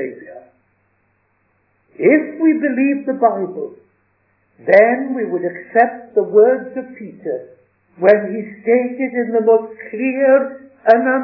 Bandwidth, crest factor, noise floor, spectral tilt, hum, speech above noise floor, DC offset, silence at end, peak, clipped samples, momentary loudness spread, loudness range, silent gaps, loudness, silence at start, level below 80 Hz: 5.4 kHz; 16 dB; -63 dBFS; -9.5 dB/octave; none; 47 dB; under 0.1%; 0 s; 0 dBFS; under 0.1%; 16 LU; 2 LU; none; -16 LUFS; 0 s; -74 dBFS